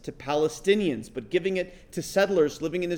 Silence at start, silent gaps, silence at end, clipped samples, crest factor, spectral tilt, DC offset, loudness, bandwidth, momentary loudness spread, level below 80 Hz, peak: 0.05 s; none; 0 s; under 0.1%; 18 dB; -5 dB/octave; under 0.1%; -26 LUFS; 19.5 kHz; 10 LU; -54 dBFS; -8 dBFS